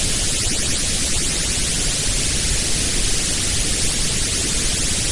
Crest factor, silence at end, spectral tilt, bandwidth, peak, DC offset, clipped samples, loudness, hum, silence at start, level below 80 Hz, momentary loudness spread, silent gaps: 14 dB; 0 s; -1.5 dB/octave; 11.5 kHz; -4 dBFS; under 0.1%; under 0.1%; -18 LUFS; none; 0 s; -26 dBFS; 0 LU; none